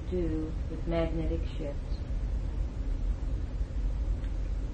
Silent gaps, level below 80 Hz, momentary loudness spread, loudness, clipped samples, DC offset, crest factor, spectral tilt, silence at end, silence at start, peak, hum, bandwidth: none; -32 dBFS; 5 LU; -35 LUFS; under 0.1%; under 0.1%; 14 dB; -8.5 dB/octave; 0 s; 0 s; -18 dBFS; none; 7.6 kHz